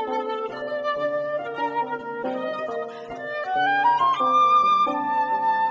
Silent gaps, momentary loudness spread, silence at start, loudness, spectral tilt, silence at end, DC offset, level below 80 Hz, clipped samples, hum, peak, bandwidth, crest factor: none; 12 LU; 0 s; -23 LUFS; -4.5 dB/octave; 0 s; under 0.1%; -68 dBFS; under 0.1%; none; -10 dBFS; 7.6 kHz; 12 dB